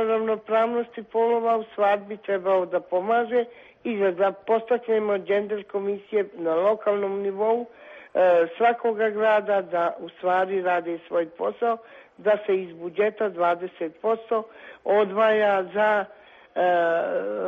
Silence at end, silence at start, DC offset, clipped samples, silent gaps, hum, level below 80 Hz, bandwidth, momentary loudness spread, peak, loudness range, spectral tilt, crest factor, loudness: 0 s; 0 s; under 0.1%; under 0.1%; none; none; -74 dBFS; 5.6 kHz; 8 LU; -10 dBFS; 3 LU; -7 dB/octave; 14 dB; -24 LUFS